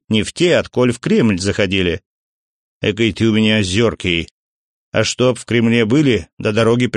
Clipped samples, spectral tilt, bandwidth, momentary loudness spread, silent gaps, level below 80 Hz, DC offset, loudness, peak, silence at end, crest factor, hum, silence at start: under 0.1%; -5.5 dB/octave; 10.5 kHz; 7 LU; 2.06-2.81 s, 4.31-4.92 s, 6.33-6.37 s; -44 dBFS; under 0.1%; -16 LUFS; -2 dBFS; 0 s; 14 dB; none; 0.1 s